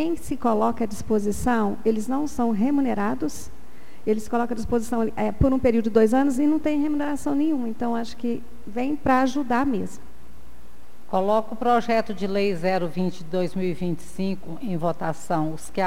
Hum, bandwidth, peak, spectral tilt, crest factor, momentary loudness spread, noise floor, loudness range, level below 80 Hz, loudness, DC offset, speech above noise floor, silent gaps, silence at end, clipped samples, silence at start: none; 16 kHz; -6 dBFS; -6.5 dB/octave; 20 dB; 9 LU; -51 dBFS; 4 LU; -44 dBFS; -24 LUFS; 4%; 27 dB; none; 0 s; under 0.1%; 0 s